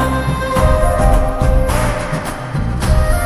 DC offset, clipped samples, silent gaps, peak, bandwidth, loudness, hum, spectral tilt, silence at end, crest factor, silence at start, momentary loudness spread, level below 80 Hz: under 0.1%; under 0.1%; none; 0 dBFS; 13 kHz; -16 LUFS; none; -6 dB/octave; 0 s; 14 dB; 0 s; 7 LU; -16 dBFS